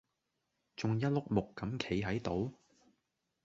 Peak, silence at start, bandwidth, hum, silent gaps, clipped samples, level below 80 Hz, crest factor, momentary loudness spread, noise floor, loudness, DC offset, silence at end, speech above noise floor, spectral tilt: -16 dBFS; 0.8 s; 7.8 kHz; none; none; under 0.1%; -60 dBFS; 22 dB; 8 LU; -85 dBFS; -36 LUFS; under 0.1%; 0.9 s; 49 dB; -6.5 dB/octave